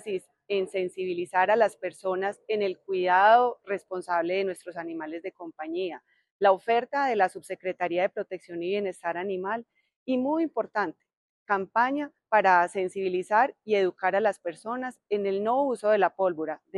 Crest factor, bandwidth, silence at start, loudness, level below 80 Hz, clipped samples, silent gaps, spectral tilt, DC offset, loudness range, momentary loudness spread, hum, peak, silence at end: 20 dB; 12 kHz; 0.05 s; -27 LUFS; -82 dBFS; under 0.1%; 6.31-6.40 s, 9.96-10.06 s, 11.17-11.46 s; -5 dB/octave; under 0.1%; 5 LU; 13 LU; none; -8 dBFS; 0 s